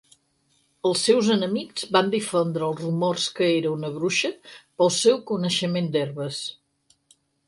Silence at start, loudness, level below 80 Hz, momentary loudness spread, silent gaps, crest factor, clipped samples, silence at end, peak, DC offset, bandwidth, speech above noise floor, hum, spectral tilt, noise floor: 0.85 s; -23 LUFS; -70 dBFS; 10 LU; none; 20 dB; under 0.1%; 0.95 s; -4 dBFS; under 0.1%; 11.5 kHz; 44 dB; none; -4.5 dB/octave; -67 dBFS